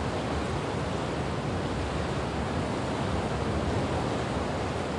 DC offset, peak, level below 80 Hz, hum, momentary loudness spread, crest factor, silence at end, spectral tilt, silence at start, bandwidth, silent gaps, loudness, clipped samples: under 0.1%; -16 dBFS; -42 dBFS; none; 2 LU; 14 dB; 0 s; -6 dB/octave; 0 s; 11.5 kHz; none; -30 LUFS; under 0.1%